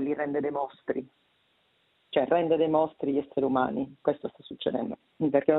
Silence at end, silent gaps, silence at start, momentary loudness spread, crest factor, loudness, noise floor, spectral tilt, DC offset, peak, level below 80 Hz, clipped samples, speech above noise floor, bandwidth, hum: 0 s; none; 0 s; 10 LU; 20 dB; -29 LUFS; -69 dBFS; -10 dB/octave; under 0.1%; -8 dBFS; -68 dBFS; under 0.1%; 42 dB; 4.1 kHz; none